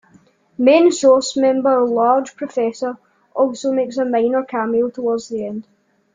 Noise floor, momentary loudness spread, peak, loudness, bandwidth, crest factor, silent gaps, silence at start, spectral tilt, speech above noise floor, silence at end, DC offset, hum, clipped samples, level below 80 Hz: -53 dBFS; 14 LU; -2 dBFS; -17 LUFS; 9.4 kHz; 16 dB; none; 0.6 s; -4 dB/octave; 36 dB; 0.55 s; under 0.1%; none; under 0.1%; -64 dBFS